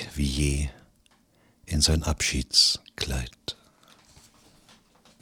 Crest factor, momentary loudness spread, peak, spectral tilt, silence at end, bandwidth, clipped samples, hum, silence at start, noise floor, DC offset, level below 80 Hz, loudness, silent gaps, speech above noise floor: 22 dB; 17 LU; -6 dBFS; -3 dB/octave; 1.7 s; 18 kHz; under 0.1%; none; 0 s; -63 dBFS; under 0.1%; -36 dBFS; -24 LUFS; none; 37 dB